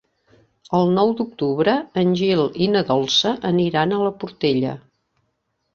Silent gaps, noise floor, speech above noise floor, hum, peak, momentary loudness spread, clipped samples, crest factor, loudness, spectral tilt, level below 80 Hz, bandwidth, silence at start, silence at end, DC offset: none; -72 dBFS; 53 dB; none; -4 dBFS; 6 LU; under 0.1%; 18 dB; -19 LUFS; -6 dB/octave; -58 dBFS; 7.4 kHz; 0.7 s; 0.95 s; under 0.1%